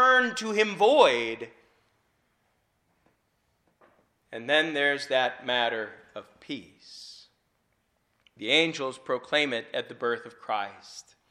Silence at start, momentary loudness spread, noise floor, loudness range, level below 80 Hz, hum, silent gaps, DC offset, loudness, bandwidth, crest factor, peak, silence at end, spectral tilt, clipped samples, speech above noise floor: 0 s; 24 LU; -73 dBFS; 7 LU; -76 dBFS; none; none; under 0.1%; -26 LUFS; 11 kHz; 24 dB; -6 dBFS; 0.3 s; -3 dB/octave; under 0.1%; 46 dB